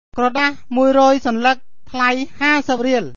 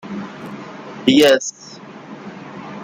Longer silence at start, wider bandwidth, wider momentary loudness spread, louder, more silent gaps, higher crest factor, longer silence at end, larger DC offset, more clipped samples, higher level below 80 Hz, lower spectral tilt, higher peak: about the same, 0.15 s vs 0.05 s; second, 7.4 kHz vs 16 kHz; second, 6 LU vs 24 LU; about the same, -16 LUFS vs -15 LUFS; neither; about the same, 14 dB vs 18 dB; about the same, 0.05 s vs 0 s; first, 3% vs under 0.1%; neither; first, -50 dBFS vs -60 dBFS; about the same, -4 dB/octave vs -3.5 dB/octave; about the same, -2 dBFS vs -2 dBFS